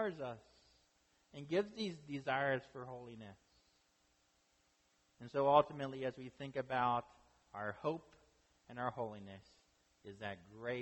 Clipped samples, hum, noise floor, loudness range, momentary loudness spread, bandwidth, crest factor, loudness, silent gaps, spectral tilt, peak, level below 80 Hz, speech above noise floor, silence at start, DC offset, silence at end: under 0.1%; none; -77 dBFS; 8 LU; 21 LU; 8.4 kHz; 28 dB; -40 LUFS; none; -6.5 dB/octave; -14 dBFS; -76 dBFS; 36 dB; 0 s; under 0.1%; 0 s